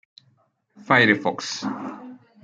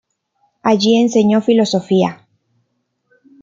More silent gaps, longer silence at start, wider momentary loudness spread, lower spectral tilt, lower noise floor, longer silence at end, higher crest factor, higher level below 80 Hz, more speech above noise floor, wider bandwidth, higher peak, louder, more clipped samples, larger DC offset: neither; about the same, 0.75 s vs 0.65 s; first, 19 LU vs 6 LU; about the same, -4.5 dB/octave vs -5.5 dB/octave; second, -64 dBFS vs -68 dBFS; second, 0.25 s vs 1.3 s; first, 22 dB vs 14 dB; second, -70 dBFS vs -60 dBFS; second, 43 dB vs 55 dB; first, 9.4 kHz vs 7.6 kHz; about the same, -2 dBFS vs -2 dBFS; second, -20 LUFS vs -14 LUFS; neither; neither